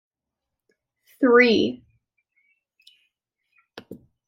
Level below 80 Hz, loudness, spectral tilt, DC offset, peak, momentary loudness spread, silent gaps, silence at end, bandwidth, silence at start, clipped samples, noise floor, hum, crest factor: -68 dBFS; -18 LUFS; -5.5 dB/octave; under 0.1%; -4 dBFS; 28 LU; none; 0.35 s; 6.2 kHz; 1.2 s; under 0.1%; -85 dBFS; none; 22 dB